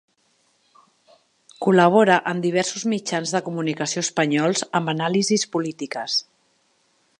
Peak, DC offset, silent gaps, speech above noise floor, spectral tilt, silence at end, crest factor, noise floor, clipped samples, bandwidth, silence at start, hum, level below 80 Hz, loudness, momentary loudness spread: -2 dBFS; under 0.1%; none; 44 dB; -4 dB/octave; 1 s; 20 dB; -65 dBFS; under 0.1%; 11 kHz; 1.6 s; none; -70 dBFS; -21 LUFS; 10 LU